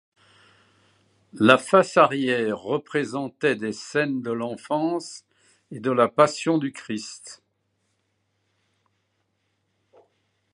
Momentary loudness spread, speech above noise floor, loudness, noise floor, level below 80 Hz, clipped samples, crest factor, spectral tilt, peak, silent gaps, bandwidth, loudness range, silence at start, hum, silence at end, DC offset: 15 LU; 50 dB; -23 LUFS; -73 dBFS; -72 dBFS; under 0.1%; 26 dB; -5 dB/octave; 0 dBFS; none; 11.5 kHz; 7 LU; 1.35 s; none; 3.2 s; under 0.1%